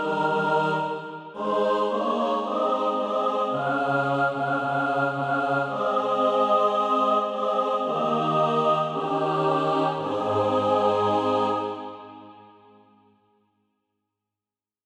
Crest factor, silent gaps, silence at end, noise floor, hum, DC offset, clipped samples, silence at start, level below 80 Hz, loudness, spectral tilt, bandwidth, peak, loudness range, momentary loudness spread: 16 dB; none; 2.45 s; under -90 dBFS; none; under 0.1%; under 0.1%; 0 s; -72 dBFS; -24 LUFS; -6.5 dB/octave; 10.5 kHz; -10 dBFS; 4 LU; 5 LU